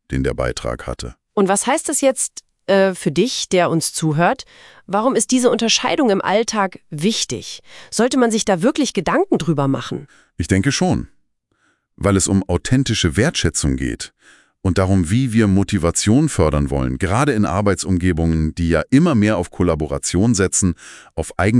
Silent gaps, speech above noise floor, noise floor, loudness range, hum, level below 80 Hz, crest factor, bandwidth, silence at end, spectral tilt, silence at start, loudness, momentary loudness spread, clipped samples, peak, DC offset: none; 46 dB; -63 dBFS; 2 LU; none; -36 dBFS; 18 dB; 12 kHz; 0 s; -5 dB/octave; 0.1 s; -18 LUFS; 10 LU; under 0.1%; 0 dBFS; under 0.1%